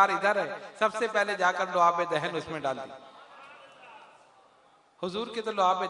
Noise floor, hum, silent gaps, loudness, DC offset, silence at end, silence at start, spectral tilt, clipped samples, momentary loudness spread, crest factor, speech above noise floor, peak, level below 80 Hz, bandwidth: -61 dBFS; none; none; -28 LUFS; under 0.1%; 0 s; 0 s; -4 dB/octave; under 0.1%; 24 LU; 22 dB; 34 dB; -8 dBFS; -74 dBFS; 11 kHz